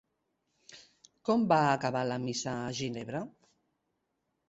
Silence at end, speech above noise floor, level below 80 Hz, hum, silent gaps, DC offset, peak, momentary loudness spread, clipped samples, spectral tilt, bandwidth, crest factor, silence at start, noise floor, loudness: 1.2 s; 51 dB; -70 dBFS; none; none; under 0.1%; -12 dBFS; 13 LU; under 0.1%; -5 dB/octave; 8.2 kHz; 22 dB; 0.7 s; -81 dBFS; -31 LUFS